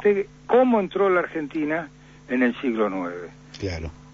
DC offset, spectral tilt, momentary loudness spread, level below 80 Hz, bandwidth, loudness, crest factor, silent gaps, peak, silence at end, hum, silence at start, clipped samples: under 0.1%; -7 dB/octave; 14 LU; -50 dBFS; 7.4 kHz; -23 LUFS; 16 dB; none; -8 dBFS; 0.05 s; 50 Hz at -50 dBFS; 0 s; under 0.1%